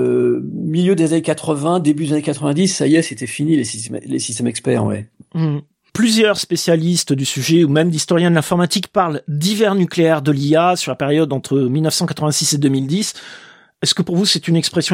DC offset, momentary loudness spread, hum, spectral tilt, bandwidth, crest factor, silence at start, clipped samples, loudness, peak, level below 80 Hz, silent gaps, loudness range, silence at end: under 0.1%; 7 LU; none; -5 dB/octave; 16.5 kHz; 16 dB; 0 s; under 0.1%; -16 LUFS; -2 dBFS; -60 dBFS; none; 3 LU; 0 s